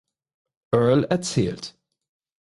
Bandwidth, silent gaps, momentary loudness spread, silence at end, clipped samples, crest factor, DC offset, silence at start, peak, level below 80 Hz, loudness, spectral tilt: 11.5 kHz; none; 15 LU; 0.75 s; under 0.1%; 18 dB; under 0.1%; 0.7 s; -6 dBFS; -54 dBFS; -22 LUFS; -6 dB/octave